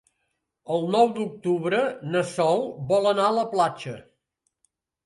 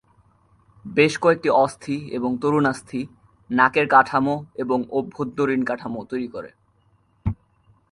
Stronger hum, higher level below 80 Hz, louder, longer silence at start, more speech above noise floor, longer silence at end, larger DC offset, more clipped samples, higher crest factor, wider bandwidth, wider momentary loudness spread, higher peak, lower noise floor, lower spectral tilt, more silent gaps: neither; second, -68 dBFS vs -48 dBFS; about the same, -24 LUFS vs -22 LUFS; second, 0.7 s vs 0.85 s; first, 54 dB vs 40 dB; first, 1.05 s vs 0.6 s; neither; neither; about the same, 18 dB vs 22 dB; about the same, 11.5 kHz vs 11.5 kHz; second, 8 LU vs 15 LU; second, -8 dBFS vs -2 dBFS; first, -77 dBFS vs -62 dBFS; about the same, -5.5 dB/octave vs -6 dB/octave; neither